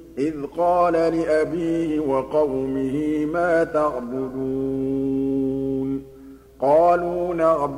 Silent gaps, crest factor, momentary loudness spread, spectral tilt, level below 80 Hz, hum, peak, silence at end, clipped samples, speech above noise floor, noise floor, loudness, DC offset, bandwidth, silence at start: none; 14 dB; 8 LU; -7.5 dB/octave; -48 dBFS; 60 Hz at -50 dBFS; -6 dBFS; 0 s; under 0.1%; 23 dB; -44 dBFS; -22 LUFS; under 0.1%; 12 kHz; 0 s